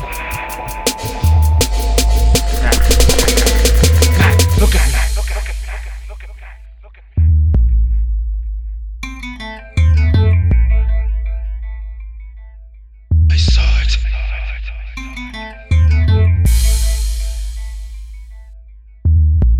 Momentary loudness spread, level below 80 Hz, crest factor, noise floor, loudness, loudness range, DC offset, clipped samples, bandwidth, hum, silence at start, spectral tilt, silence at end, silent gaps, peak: 17 LU; -16 dBFS; 14 dB; -38 dBFS; -15 LUFS; 6 LU; under 0.1%; under 0.1%; 20 kHz; none; 0 s; -4.5 dB/octave; 0 s; none; 0 dBFS